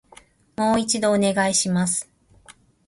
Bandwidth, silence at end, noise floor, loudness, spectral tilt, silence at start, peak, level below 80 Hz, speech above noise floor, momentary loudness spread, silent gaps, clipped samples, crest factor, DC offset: 12 kHz; 0.35 s; -52 dBFS; -21 LUFS; -3.5 dB/octave; 0.6 s; -8 dBFS; -56 dBFS; 31 dB; 6 LU; none; under 0.1%; 16 dB; under 0.1%